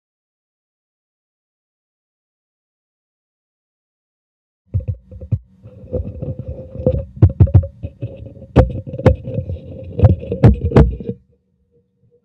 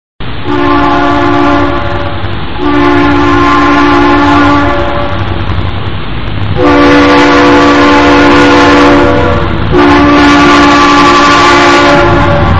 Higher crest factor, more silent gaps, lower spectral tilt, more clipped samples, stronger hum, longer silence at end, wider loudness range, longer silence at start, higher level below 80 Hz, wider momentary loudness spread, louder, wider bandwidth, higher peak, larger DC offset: first, 18 dB vs 6 dB; neither; first, -10.5 dB/octave vs -5.5 dB/octave; second, under 0.1% vs 4%; neither; first, 1.1 s vs 0 s; first, 14 LU vs 4 LU; first, 4.75 s vs 0.2 s; second, -28 dBFS vs -22 dBFS; first, 17 LU vs 11 LU; second, -17 LUFS vs -5 LUFS; second, 5.4 kHz vs 10 kHz; about the same, 0 dBFS vs 0 dBFS; second, under 0.1% vs 20%